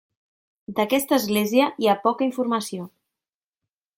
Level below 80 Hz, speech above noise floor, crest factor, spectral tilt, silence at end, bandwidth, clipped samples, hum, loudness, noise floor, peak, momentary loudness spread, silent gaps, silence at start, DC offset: -66 dBFS; over 68 dB; 18 dB; -4.5 dB/octave; 1.1 s; 17 kHz; under 0.1%; none; -22 LUFS; under -90 dBFS; -6 dBFS; 12 LU; none; 0.7 s; under 0.1%